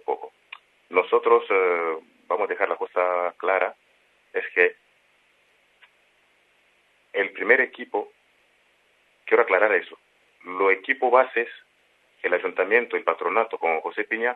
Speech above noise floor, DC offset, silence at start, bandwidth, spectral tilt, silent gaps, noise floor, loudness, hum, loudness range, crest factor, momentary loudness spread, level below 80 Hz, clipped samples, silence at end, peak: 41 dB; under 0.1%; 0.1 s; 4.2 kHz; -5.5 dB/octave; none; -63 dBFS; -23 LUFS; 50 Hz at -80 dBFS; 5 LU; 22 dB; 13 LU; -84 dBFS; under 0.1%; 0 s; -2 dBFS